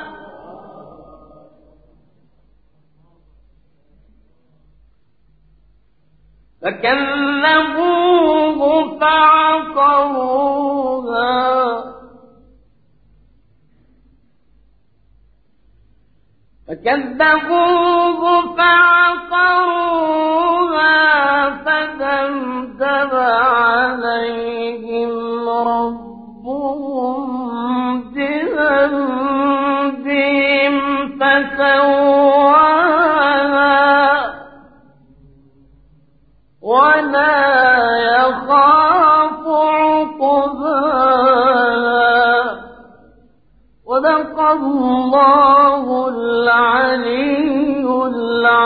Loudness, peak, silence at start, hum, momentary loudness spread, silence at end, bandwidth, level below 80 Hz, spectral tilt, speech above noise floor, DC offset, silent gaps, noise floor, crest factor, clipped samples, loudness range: -14 LUFS; 0 dBFS; 0 s; none; 11 LU; 0 s; 5 kHz; -52 dBFS; -9 dB/octave; 45 dB; 0.2%; none; -58 dBFS; 16 dB; under 0.1%; 8 LU